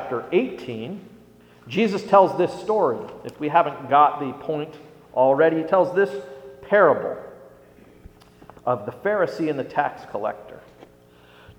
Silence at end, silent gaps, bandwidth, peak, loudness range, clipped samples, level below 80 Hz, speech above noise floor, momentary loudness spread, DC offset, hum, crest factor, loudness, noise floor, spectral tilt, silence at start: 0.1 s; none; 14.5 kHz; -2 dBFS; 7 LU; under 0.1%; -62 dBFS; 30 dB; 18 LU; under 0.1%; 60 Hz at -55 dBFS; 20 dB; -22 LUFS; -51 dBFS; -7 dB/octave; 0 s